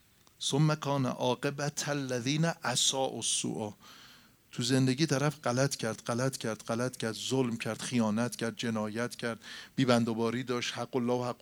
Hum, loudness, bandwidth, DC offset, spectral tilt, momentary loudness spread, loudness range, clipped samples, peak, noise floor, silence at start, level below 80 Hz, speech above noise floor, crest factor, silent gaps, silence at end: none; -31 LUFS; over 20 kHz; under 0.1%; -4.5 dB/octave; 8 LU; 2 LU; under 0.1%; -10 dBFS; -58 dBFS; 0.4 s; -74 dBFS; 27 dB; 22 dB; none; 0.05 s